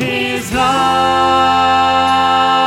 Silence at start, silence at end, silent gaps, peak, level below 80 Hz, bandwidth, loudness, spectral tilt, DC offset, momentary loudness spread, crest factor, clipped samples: 0 s; 0 s; none; -2 dBFS; -40 dBFS; 16 kHz; -12 LUFS; -3.5 dB/octave; under 0.1%; 5 LU; 12 dB; under 0.1%